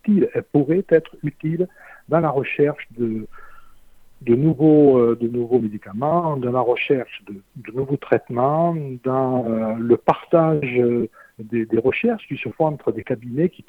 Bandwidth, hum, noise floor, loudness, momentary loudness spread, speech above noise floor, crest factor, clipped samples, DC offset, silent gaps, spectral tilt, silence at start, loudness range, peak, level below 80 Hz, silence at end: 4.3 kHz; none; -46 dBFS; -20 LUFS; 11 LU; 26 dB; 18 dB; under 0.1%; under 0.1%; none; -10 dB/octave; 0.05 s; 4 LU; 0 dBFS; -56 dBFS; 0.2 s